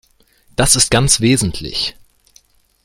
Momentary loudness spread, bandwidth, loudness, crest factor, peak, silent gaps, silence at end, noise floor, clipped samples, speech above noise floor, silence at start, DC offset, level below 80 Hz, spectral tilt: 11 LU; 16.5 kHz; -14 LUFS; 18 dB; 0 dBFS; none; 0.95 s; -53 dBFS; under 0.1%; 39 dB; 0.6 s; under 0.1%; -34 dBFS; -3 dB/octave